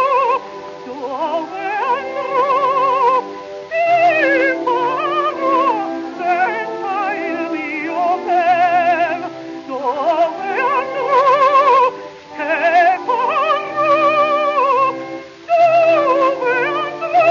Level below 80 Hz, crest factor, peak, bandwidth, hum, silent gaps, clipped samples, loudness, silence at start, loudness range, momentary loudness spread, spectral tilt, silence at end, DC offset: -66 dBFS; 12 dB; -4 dBFS; 7.2 kHz; none; none; under 0.1%; -16 LUFS; 0 s; 4 LU; 12 LU; -4.5 dB/octave; 0 s; under 0.1%